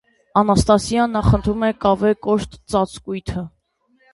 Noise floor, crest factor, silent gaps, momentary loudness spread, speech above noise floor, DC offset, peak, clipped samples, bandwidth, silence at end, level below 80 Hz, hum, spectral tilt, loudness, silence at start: -62 dBFS; 18 dB; none; 12 LU; 44 dB; under 0.1%; -2 dBFS; under 0.1%; 11.5 kHz; 0.65 s; -34 dBFS; none; -6.5 dB/octave; -19 LUFS; 0.35 s